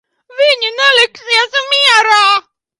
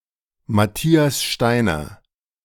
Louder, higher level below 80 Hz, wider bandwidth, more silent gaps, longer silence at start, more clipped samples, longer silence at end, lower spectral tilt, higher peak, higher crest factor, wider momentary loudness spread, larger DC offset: first, -10 LUFS vs -19 LUFS; second, -68 dBFS vs -44 dBFS; second, 11.5 kHz vs 18 kHz; neither; second, 0.35 s vs 0.5 s; neither; about the same, 0.4 s vs 0.5 s; second, 3 dB/octave vs -5 dB/octave; about the same, 0 dBFS vs -2 dBFS; second, 12 dB vs 18 dB; about the same, 6 LU vs 8 LU; neither